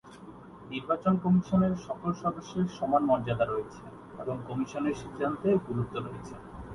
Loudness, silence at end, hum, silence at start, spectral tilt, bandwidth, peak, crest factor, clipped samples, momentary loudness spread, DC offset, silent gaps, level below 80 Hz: -30 LUFS; 0 s; none; 0.05 s; -8 dB/octave; 11 kHz; -12 dBFS; 18 dB; under 0.1%; 19 LU; under 0.1%; none; -56 dBFS